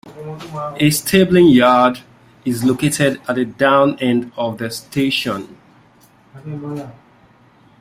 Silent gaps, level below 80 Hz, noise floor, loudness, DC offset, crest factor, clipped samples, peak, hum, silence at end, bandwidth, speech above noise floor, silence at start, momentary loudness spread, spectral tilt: none; -52 dBFS; -50 dBFS; -16 LUFS; under 0.1%; 16 dB; under 0.1%; 0 dBFS; none; 0.9 s; 16 kHz; 34 dB; 0.05 s; 20 LU; -5 dB/octave